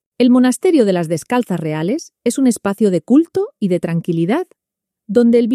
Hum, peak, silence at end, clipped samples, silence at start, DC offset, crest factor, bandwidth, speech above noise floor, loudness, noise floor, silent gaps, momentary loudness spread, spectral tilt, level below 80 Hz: none; 0 dBFS; 0 s; under 0.1%; 0.2 s; under 0.1%; 14 dB; 14 kHz; 66 dB; -16 LUFS; -81 dBFS; none; 8 LU; -6.5 dB/octave; -62 dBFS